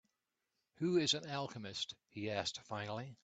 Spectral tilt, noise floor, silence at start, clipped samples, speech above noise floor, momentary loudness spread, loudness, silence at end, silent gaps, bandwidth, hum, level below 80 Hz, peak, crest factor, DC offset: -4 dB/octave; -88 dBFS; 0.8 s; under 0.1%; 48 dB; 10 LU; -39 LUFS; 0.1 s; none; 9 kHz; none; -78 dBFS; -20 dBFS; 22 dB; under 0.1%